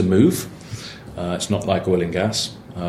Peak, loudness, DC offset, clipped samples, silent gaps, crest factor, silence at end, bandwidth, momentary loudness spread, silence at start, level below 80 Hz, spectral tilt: -2 dBFS; -21 LUFS; under 0.1%; under 0.1%; none; 20 dB; 0 s; 15.5 kHz; 16 LU; 0 s; -48 dBFS; -5.5 dB/octave